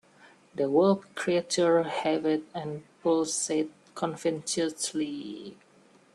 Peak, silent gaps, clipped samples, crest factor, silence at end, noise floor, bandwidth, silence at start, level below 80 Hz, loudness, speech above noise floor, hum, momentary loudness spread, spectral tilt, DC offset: -12 dBFS; none; under 0.1%; 18 dB; 0.6 s; -60 dBFS; 12.5 kHz; 0.55 s; -74 dBFS; -28 LUFS; 32 dB; none; 14 LU; -4 dB/octave; under 0.1%